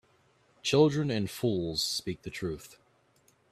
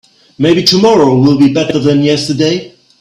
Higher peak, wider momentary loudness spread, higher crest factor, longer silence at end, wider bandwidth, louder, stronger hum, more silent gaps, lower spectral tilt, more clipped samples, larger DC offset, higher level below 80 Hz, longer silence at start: second, -10 dBFS vs 0 dBFS; first, 13 LU vs 6 LU; first, 22 dB vs 10 dB; first, 0.75 s vs 0.3 s; about the same, 14.5 kHz vs 15.5 kHz; second, -30 LUFS vs -10 LUFS; neither; neither; about the same, -5 dB/octave vs -5.5 dB/octave; neither; neither; second, -60 dBFS vs -48 dBFS; first, 0.65 s vs 0.4 s